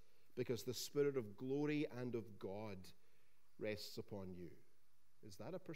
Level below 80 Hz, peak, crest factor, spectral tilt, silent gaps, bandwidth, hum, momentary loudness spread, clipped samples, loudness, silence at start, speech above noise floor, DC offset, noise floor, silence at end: -86 dBFS; -28 dBFS; 18 dB; -5.5 dB/octave; none; 16 kHz; none; 17 LU; under 0.1%; -46 LUFS; 0.35 s; 36 dB; 0.2%; -82 dBFS; 0 s